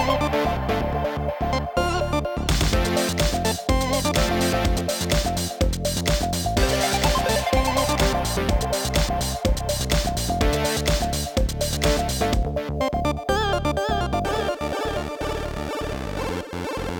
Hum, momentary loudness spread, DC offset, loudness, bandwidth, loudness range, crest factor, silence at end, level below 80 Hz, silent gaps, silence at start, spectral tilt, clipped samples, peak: none; 7 LU; under 0.1%; -23 LUFS; 19 kHz; 3 LU; 14 dB; 0 s; -28 dBFS; none; 0 s; -4.5 dB/octave; under 0.1%; -8 dBFS